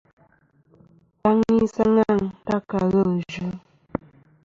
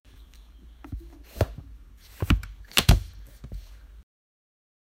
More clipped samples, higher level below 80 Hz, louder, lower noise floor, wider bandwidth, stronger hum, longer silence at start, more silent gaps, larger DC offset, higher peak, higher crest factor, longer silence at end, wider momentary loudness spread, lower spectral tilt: neither; second, -52 dBFS vs -34 dBFS; first, -22 LUFS vs -26 LUFS; first, -60 dBFS vs -49 dBFS; second, 7.4 kHz vs 16 kHz; neither; first, 1.25 s vs 0.9 s; neither; neither; second, -8 dBFS vs 0 dBFS; second, 16 dB vs 30 dB; second, 0.5 s vs 1.25 s; second, 15 LU vs 24 LU; first, -8 dB/octave vs -4.5 dB/octave